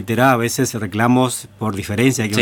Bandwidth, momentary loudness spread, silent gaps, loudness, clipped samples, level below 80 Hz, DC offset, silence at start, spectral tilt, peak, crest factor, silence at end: 19 kHz; 9 LU; none; -17 LUFS; under 0.1%; -52 dBFS; under 0.1%; 0 s; -5 dB/octave; 0 dBFS; 16 dB; 0 s